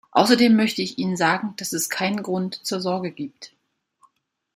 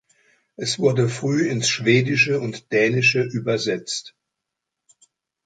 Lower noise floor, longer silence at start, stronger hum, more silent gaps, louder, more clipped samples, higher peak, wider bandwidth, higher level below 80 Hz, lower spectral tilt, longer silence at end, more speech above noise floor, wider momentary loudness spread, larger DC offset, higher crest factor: second, -63 dBFS vs -83 dBFS; second, 0.15 s vs 0.6 s; neither; neither; about the same, -22 LUFS vs -20 LUFS; neither; about the same, -2 dBFS vs -4 dBFS; first, 16 kHz vs 9.4 kHz; about the same, -68 dBFS vs -64 dBFS; about the same, -4 dB/octave vs -4.5 dB/octave; second, 1.1 s vs 1.35 s; second, 42 dB vs 62 dB; about the same, 11 LU vs 10 LU; neither; about the same, 20 dB vs 18 dB